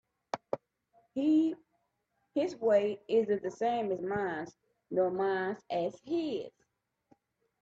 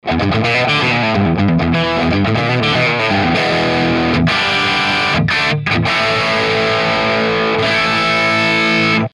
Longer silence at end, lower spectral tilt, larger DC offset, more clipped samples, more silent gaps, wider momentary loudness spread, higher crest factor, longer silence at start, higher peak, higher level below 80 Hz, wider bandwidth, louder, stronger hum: first, 1.15 s vs 0.05 s; about the same, -6.5 dB/octave vs -5.5 dB/octave; neither; neither; neither; first, 13 LU vs 2 LU; first, 18 dB vs 12 dB; first, 0.35 s vs 0.05 s; second, -16 dBFS vs -2 dBFS; second, -76 dBFS vs -38 dBFS; second, 7.8 kHz vs 12 kHz; second, -33 LUFS vs -13 LUFS; neither